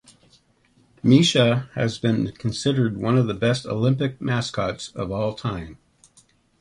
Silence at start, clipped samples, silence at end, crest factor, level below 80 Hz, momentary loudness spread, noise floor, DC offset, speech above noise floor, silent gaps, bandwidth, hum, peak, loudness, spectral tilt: 1.05 s; under 0.1%; 0.85 s; 20 dB; -50 dBFS; 12 LU; -60 dBFS; under 0.1%; 39 dB; none; 11.5 kHz; none; -4 dBFS; -22 LUFS; -6 dB/octave